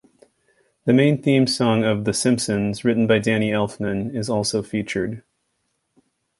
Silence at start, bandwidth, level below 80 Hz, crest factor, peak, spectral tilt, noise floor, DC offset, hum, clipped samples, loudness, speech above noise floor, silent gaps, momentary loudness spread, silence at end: 0.85 s; 11.5 kHz; -54 dBFS; 18 dB; -4 dBFS; -5.5 dB/octave; -72 dBFS; under 0.1%; none; under 0.1%; -20 LUFS; 53 dB; none; 8 LU; 1.2 s